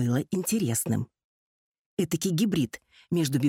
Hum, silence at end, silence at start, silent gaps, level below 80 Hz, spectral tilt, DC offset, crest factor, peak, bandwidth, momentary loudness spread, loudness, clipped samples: none; 0 s; 0 s; 1.24-1.97 s; -62 dBFS; -5.5 dB/octave; under 0.1%; 16 dB; -12 dBFS; 17 kHz; 9 LU; -28 LUFS; under 0.1%